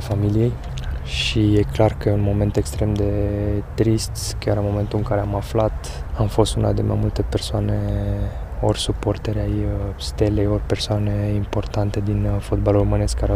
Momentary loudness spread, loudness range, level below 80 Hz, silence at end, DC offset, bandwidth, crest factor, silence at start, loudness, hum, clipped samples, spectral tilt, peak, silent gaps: 6 LU; 2 LU; -28 dBFS; 0 s; under 0.1%; 14.5 kHz; 18 dB; 0 s; -21 LUFS; none; under 0.1%; -6.5 dB/octave; -2 dBFS; none